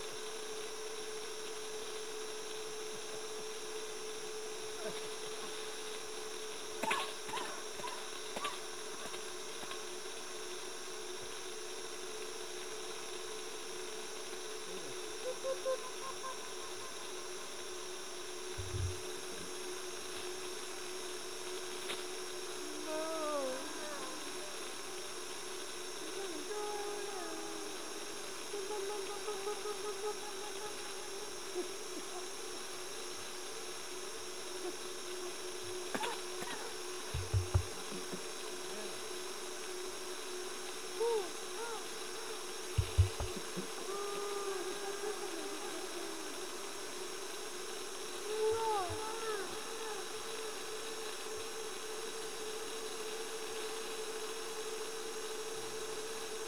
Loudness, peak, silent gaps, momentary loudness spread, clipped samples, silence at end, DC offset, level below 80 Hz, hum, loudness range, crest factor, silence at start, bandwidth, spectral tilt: -41 LUFS; -16 dBFS; none; 6 LU; under 0.1%; 0 s; 0.4%; -58 dBFS; none; 4 LU; 26 dB; 0 s; over 20 kHz; -3 dB/octave